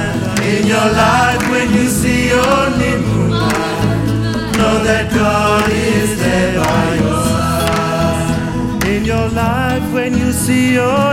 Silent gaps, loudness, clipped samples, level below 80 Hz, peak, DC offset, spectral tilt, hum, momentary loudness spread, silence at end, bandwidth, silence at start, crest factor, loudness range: none; -14 LUFS; under 0.1%; -28 dBFS; -2 dBFS; under 0.1%; -5 dB/octave; none; 4 LU; 0 s; 16.5 kHz; 0 s; 12 dB; 2 LU